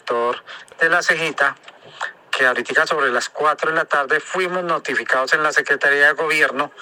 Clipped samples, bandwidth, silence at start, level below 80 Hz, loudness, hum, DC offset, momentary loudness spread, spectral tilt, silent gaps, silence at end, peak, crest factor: under 0.1%; 18 kHz; 0.05 s; -76 dBFS; -18 LUFS; none; under 0.1%; 10 LU; -2.5 dB/octave; none; 0 s; -2 dBFS; 18 dB